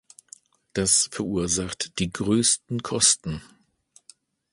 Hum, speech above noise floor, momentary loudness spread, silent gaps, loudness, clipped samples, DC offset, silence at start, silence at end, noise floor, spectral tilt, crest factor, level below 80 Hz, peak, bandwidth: none; 36 dB; 11 LU; none; -22 LUFS; under 0.1%; under 0.1%; 0.75 s; 1.15 s; -60 dBFS; -2.5 dB/octave; 22 dB; -50 dBFS; -4 dBFS; 11.5 kHz